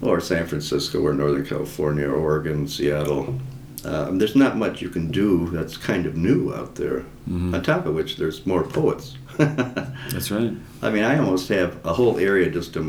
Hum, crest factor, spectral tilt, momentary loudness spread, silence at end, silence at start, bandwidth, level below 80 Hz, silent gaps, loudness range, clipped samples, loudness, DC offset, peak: none; 20 dB; -6 dB/octave; 9 LU; 0 s; 0 s; 19.5 kHz; -44 dBFS; none; 2 LU; under 0.1%; -23 LUFS; under 0.1%; -4 dBFS